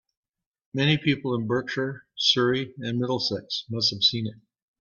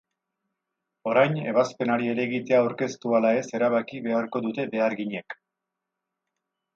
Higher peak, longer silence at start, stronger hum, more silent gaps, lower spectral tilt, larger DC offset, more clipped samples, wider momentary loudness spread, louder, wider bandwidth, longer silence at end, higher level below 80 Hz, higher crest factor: about the same, -6 dBFS vs -8 dBFS; second, 0.75 s vs 1.05 s; neither; neither; about the same, -5 dB/octave vs -6 dB/octave; neither; neither; about the same, 10 LU vs 10 LU; about the same, -25 LUFS vs -25 LUFS; about the same, 7.4 kHz vs 7.6 kHz; second, 0.45 s vs 1.4 s; first, -64 dBFS vs -76 dBFS; about the same, 20 dB vs 20 dB